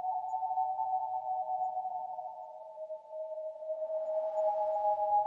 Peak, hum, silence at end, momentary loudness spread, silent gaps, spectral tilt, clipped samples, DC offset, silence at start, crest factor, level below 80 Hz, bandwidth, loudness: -22 dBFS; none; 0 s; 13 LU; none; -5 dB/octave; under 0.1%; under 0.1%; 0 s; 14 dB; -84 dBFS; 7.2 kHz; -35 LUFS